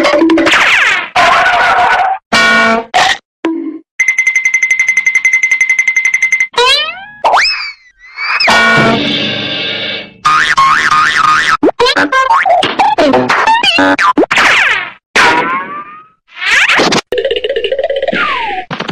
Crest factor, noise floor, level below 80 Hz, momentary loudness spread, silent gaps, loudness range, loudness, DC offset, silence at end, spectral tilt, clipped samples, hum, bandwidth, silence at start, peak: 10 dB; -35 dBFS; -44 dBFS; 9 LU; 2.26-2.31 s, 3.25-3.43 s, 3.91-3.98 s, 15.06-15.14 s; 2 LU; -9 LUFS; under 0.1%; 0 s; -2.5 dB/octave; under 0.1%; none; 16 kHz; 0 s; 0 dBFS